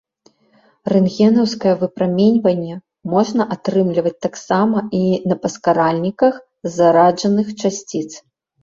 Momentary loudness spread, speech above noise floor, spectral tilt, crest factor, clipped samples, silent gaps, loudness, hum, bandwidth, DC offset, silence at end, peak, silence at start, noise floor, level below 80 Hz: 12 LU; 40 dB; -6.5 dB/octave; 14 dB; under 0.1%; none; -17 LUFS; none; 7.6 kHz; under 0.1%; 0.45 s; -2 dBFS; 0.85 s; -56 dBFS; -58 dBFS